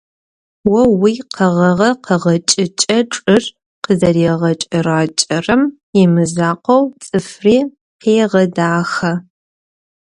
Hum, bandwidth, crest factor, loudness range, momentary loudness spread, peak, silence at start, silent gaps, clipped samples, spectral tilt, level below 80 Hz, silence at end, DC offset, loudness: none; 11 kHz; 14 dB; 1 LU; 6 LU; 0 dBFS; 0.65 s; 3.66-3.82 s, 5.83-5.93 s, 7.81-7.99 s; under 0.1%; -5 dB/octave; -48 dBFS; 0.95 s; under 0.1%; -14 LUFS